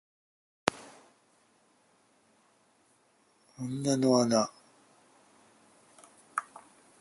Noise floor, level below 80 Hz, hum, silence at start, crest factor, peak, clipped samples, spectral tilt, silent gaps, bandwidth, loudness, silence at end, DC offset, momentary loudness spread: -68 dBFS; -74 dBFS; none; 0.65 s; 34 dB; -2 dBFS; under 0.1%; -4.5 dB/octave; none; 11.5 kHz; -30 LUFS; 0.4 s; under 0.1%; 27 LU